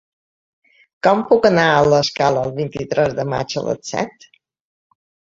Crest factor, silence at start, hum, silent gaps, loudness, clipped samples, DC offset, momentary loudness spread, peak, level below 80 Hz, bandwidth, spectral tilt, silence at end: 18 dB; 1.05 s; none; none; -17 LUFS; under 0.1%; under 0.1%; 11 LU; -2 dBFS; -52 dBFS; 7.8 kHz; -5 dB/octave; 1.3 s